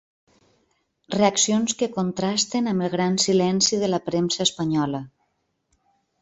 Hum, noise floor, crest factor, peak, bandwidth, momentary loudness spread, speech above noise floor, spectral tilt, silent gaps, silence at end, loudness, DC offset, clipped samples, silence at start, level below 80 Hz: none; -72 dBFS; 20 dB; -4 dBFS; 8.2 kHz; 6 LU; 50 dB; -4 dB/octave; none; 1.15 s; -22 LUFS; under 0.1%; under 0.1%; 1.1 s; -62 dBFS